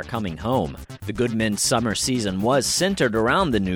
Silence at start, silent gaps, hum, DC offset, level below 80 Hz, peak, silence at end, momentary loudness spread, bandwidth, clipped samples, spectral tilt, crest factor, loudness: 0 s; none; none; under 0.1%; -42 dBFS; -6 dBFS; 0 s; 9 LU; 18 kHz; under 0.1%; -4 dB/octave; 16 dB; -22 LUFS